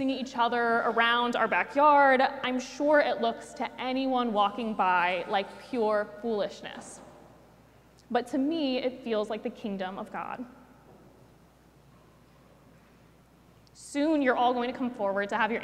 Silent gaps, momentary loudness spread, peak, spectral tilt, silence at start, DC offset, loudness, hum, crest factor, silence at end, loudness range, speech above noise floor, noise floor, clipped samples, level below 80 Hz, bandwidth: none; 13 LU; -10 dBFS; -4.5 dB/octave; 0 s; under 0.1%; -28 LUFS; none; 18 dB; 0 s; 14 LU; 31 dB; -58 dBFS; under 0.1%; -66 dBFS; 13 kHz